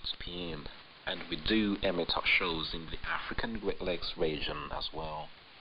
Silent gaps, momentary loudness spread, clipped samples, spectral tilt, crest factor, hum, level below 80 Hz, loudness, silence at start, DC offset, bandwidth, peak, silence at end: none; 14 LU; under 0.1%; -7 dB/octave; 18 dB; none; -48 dBFS; -34 LUFS; 0 s; under 0.1%; 5.4 kHz; -16 dBFS; 0 s